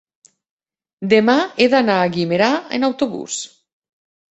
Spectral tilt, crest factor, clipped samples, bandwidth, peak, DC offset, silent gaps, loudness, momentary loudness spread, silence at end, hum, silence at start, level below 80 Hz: -4.5 dB/octave; 16 dB; under 0.1%; 8.2 kHz; -2 dBFS; under 0.1%; none; -17 LUFS; 13 LU; 0.9 s; none; 1 s; -60 dBFS